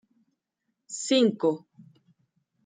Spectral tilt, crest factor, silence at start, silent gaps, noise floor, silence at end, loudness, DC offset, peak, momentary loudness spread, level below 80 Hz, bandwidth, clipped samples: -4 dB/octave; 18 dB; 0.9 s; none; -81 dBFS; 0.85 s; -25 LUFS; under 0.1%; -12 dBFS; 16 LU; -82 dBFS; 9.6 kHz; under 0.1%